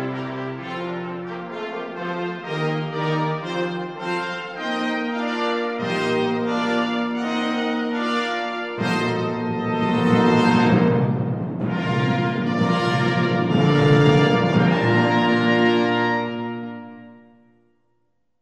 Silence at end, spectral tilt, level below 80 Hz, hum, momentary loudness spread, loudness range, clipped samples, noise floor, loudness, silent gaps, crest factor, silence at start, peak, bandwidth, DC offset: 1.25 s; -7 dB/octave; -58 dBFS; none; 12 LU; 8 LU; under 0.1%; -72 dBFS; -21 LUFS; none; 18 dB; 0 s; -2 dBFS; 10 kHz; under 0.1%